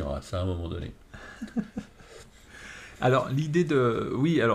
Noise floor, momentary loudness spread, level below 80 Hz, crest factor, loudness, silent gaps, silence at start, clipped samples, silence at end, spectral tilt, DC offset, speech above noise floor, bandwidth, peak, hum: -50 dBFS; 22 LU; -48 dBFS; 16 dB; -27 LUFS; none; 0 s; under 0.1%; 0 s; -7 dB/octave; under 0.1%; 24 dB; 13 kHz; -12 dBFS; none